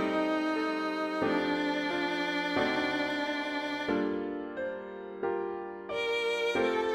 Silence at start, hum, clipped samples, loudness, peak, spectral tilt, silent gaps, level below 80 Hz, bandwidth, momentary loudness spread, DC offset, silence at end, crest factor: 0 s; none; under 0.1%; -31 LUFS; -16 dBFS; -4.5 dB/octave; none; -66 dBFS; 13.5 kHz; 8 LU; under 0.1%; 0 s; 14 dB